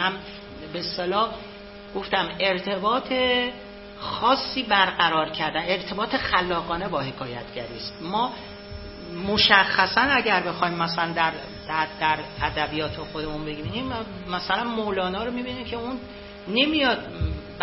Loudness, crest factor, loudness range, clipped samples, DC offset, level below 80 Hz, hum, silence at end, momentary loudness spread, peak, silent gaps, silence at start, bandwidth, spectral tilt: -24 LUFS; 26 dB; 7 LU; under 0.1%; under 0.1%; -44 dBFS; none; 0 s; 16 LU; 0 dBFS; none; 0 s; 6 kHz; -7.5 dB/octave